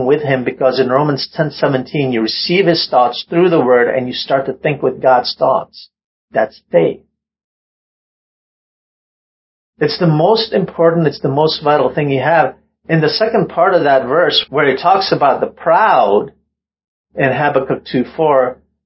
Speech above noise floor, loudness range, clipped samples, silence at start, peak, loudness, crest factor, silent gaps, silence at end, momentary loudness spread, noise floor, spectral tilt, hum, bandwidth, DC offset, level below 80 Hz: over 77 dB; 9 LU; under 0.1%; 0 s; 0 dBFS; -14 LUFS; 14 dB; 6.04-6.28 s, 7.44-9.73 s, 16.88-17.04 s; 0.3 s; 7 LU; under -90 dBFS; -9 dB/octave; none; 5.8 kHz; under 0.1%; -54 dBFS